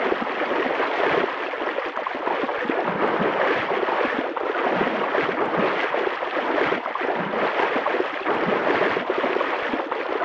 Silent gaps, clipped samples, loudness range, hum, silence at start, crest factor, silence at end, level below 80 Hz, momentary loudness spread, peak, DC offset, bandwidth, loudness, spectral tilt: none; under 0.1%; 1 LU; none; 0 s; 18 dB; 0 s; -64 dBFS; 4 LU; -6 dBFS; under 0.1%; 7.8 kHz; -23 LUFS; -6 dB/octave